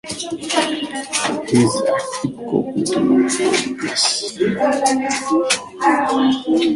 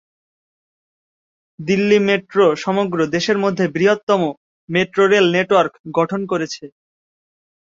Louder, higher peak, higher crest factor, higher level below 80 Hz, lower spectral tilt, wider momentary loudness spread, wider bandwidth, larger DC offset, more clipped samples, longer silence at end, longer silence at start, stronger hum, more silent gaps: about the same, -18 LUFS vs -17 LUFS; about the same, -2 dBFS vs -2 dBFS; about the same, 16 dB vs 16 dB; about the same, -56 dBFS vs -60 dBFS; second, -3.5 dB/octave vs -5.5 dB/octave; about the same, 6 LU vs 8 LU; first, 11.5 kHz vs 7.6 kHz; neither; neither; second, 0 s vs 1.05 s; second, 0.05 s vs 1.6 s; neither; second, none vs 4.03-4.07 s, 4.37-4.68 s, 5.80-5.84 s